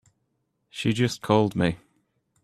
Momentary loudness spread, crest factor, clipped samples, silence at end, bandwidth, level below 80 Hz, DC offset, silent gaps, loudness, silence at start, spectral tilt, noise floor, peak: 15 LU; 22 dB; under 0.1%; 0.65 s; 13.5 kHz; -58 dBFS; under 0.1%; none; -24 LUFS; 0.75 s; -6 dB/octave; -75 dBFS; -6 dBFS